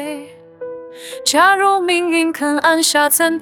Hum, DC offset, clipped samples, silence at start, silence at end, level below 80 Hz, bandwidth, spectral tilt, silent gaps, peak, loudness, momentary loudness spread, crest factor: none; under 0.1%; under 0.1%; 0 s; 0 s; -64 dBFS; over 20 kHz; -0.5 dB/octave; none; 0 dBFS; -14 LUFS; 20 LU; 16 dB